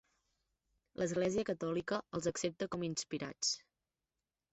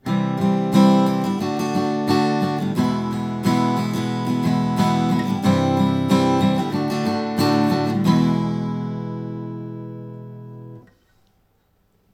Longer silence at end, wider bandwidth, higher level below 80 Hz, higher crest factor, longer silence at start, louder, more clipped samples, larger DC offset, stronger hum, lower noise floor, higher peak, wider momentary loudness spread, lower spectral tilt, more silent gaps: second, 0.95 s vs 1.35 s; second, 8.2 kHz vs 16 kHz; second, -70 dBFS vs -56 dBFS; about the same, 18 dB vs 18 dB; first, 1 s vs 0.05 s; second, -38 LUFS vs -20 LUFS; neither; neither; neither; first, under -90 dBFS vs -63 dBFS; second, -22 dBFS vs -2 dBFS; second, 5 LU vs 14 LU; second, -4 dB/octave vs -7 dB/octave; neither